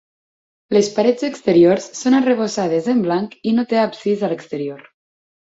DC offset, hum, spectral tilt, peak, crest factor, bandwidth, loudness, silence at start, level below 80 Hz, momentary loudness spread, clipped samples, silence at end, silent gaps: under 0.1%; none; -5.5 dB/octave; -2 dBFS; 16 dB; 8 kHz; -18 LUFS; 0.7 s; -62 dBFS; 9 LU; under 0.1%; 0.7 s; none